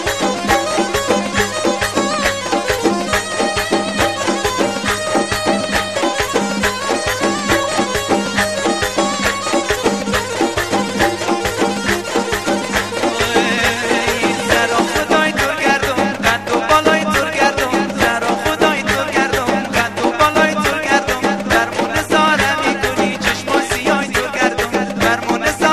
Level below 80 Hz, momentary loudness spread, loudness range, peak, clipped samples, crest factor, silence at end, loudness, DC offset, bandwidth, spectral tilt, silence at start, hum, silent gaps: -38 dBFS; 4 LU; 2 LU; 0 dBFS; under 0.1%; 16 dB; 0 s; -16 LUFS; 0.5%; 13.5 kHz; -3.5 dB/octave; 0 s; none; none